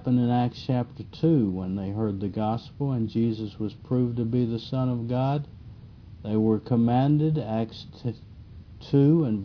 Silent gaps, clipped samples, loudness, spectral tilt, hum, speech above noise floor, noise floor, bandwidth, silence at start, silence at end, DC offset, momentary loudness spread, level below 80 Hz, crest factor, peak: none; under 0.1%; -26 LUFS; -10 dB/octave; none; 20 dB; -45 dBFS; 5.4 kHz; 0 s; 0 s; under 0.1%; 13 LU; -54 dBFS; 16 dB; -10 dBFS